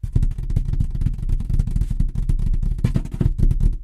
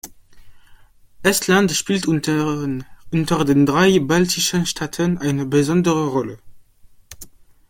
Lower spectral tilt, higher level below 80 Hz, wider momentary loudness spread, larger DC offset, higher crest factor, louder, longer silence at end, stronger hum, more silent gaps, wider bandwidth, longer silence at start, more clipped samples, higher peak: first, -8.5 dB/octave vs -4.5 dB/octave; first, -20 dBFS vs -48 dBFS; second, 4 LU vs 10 LU; neither; second, 14 dB vs 20 dB; second, -24 LUFS vs -18 LUFS; second, 0 s vs 0.4 s; neither; neither; second, 4.5 kHz vs 17 kHz; about the same, 0.05 s vs 0.05 s; neither; second, -4 dBFS vs 0 dBFS